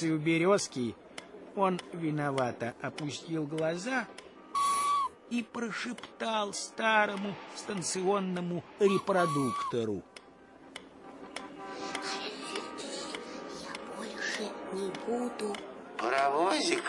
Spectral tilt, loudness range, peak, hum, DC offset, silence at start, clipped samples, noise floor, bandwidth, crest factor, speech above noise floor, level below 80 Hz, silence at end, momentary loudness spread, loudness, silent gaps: -4 dB/octave; 8 LU; -12 dBFS; none; under 0.1%; 0 s; under 0.1%; -55 dBFS; 11.5 kHz; 20 dB; 23 dB; -74 dBFS; 0 s; 15 LU; -33 LUFS; none